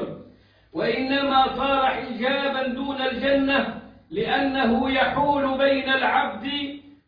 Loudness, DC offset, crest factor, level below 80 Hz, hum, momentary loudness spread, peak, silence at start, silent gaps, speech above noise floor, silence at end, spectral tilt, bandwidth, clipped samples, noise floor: -22 LUFS; under 0.1%; 16 dB; -50 dBFS; none; 10 LU; -8 dBFS; 0 s; none; 30 dB; 0.2 s; -7 dB/octave; 5.2 kHz; under 0.1%; -53 dBFS